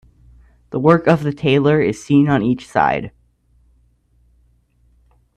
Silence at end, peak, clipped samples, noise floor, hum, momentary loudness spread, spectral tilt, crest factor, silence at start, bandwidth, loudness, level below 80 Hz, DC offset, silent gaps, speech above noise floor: 2.3 s; 0 dBFS; under 0.1%; -57 dBFS; none; 7 LU; -7.5 dB/octave; 18 dB; 0.7 s; 10 kHz; -16 LUFS; -48 dBFS; under 0.1%; none; 42 dB